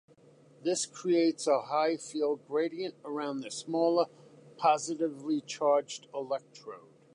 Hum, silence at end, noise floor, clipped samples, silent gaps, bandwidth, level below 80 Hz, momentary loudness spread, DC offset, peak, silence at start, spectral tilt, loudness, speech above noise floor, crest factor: none; 0.35 s; -59 dBFS; under 0.1%; none; 11 kHz; -88 dBFS; 11 LU; under 0.1%; -12 dBFS; 0.6 s; -4 dB/octave; -31 LUFS; 29 dB; 18 dB